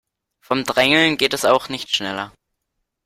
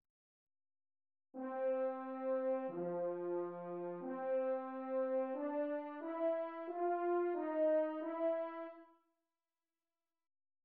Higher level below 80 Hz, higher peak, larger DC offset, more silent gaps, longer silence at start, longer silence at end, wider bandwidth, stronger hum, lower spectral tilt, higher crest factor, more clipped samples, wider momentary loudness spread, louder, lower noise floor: first, -56 dBFS vs under -90 dBFS; first, -2 dBFS vs -28 dBFS; neither; neither; second, 0.5 s vs 1.35 s; second, 0.75 s vs 1.8 s; first, 16.5 kHz vs 4.2 kHz; neither; second, -3 dB/octave vs -6.5 dB/octave; first, 20 dB vs 14 dB; neither; first, 13 LU vs 8 LU; first, -18 LUFS vs -40 LUFS; second, -76 dBFS vs under -90 dBFS